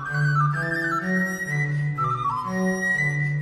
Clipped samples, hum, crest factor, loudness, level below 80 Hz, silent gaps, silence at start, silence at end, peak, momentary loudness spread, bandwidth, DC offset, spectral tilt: under 0.1%; none; 12 dB; -23 LUFS; -54 dBFS; none; 0 s; 0 s; -12 dBFS; 4 LU; 14 kHz; under 0.1%; -6.5 dB/octave